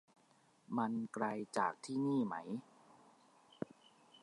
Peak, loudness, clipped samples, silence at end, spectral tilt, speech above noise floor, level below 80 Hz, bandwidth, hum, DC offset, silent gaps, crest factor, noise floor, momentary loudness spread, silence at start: -20 dBFS; -40 LUFS; under 0.1%; 0.05 s; -6 dB/octave; 32 dB; -88 dBFS; 11.5 kHz; none; under 0.1%; none; 22 dB; -71 dBFS; 13 LU; 0.7 s